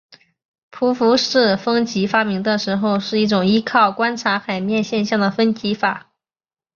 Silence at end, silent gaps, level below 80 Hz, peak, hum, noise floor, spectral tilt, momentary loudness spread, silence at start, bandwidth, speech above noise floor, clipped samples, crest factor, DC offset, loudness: 0.75 s; none; -60 dBFS; -2 dBFS; none; under -90 dBFS; -5 dB/octave; 6 LU; 0.75 s; 7.2 kHz; over 73 dB; under 0.1%; 16 dB; under 0.1%; -18 LUFS